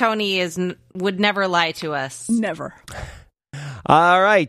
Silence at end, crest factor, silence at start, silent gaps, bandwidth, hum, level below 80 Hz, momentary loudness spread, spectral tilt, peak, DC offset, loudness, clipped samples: 0 s; 20 dB; 0 s; none; 14.5 kHz; none; -50 dBFS; 21 LU; -4.5 dB/octave; 0 dBFS; under 0.1%; -19 LUFS; under 0.1%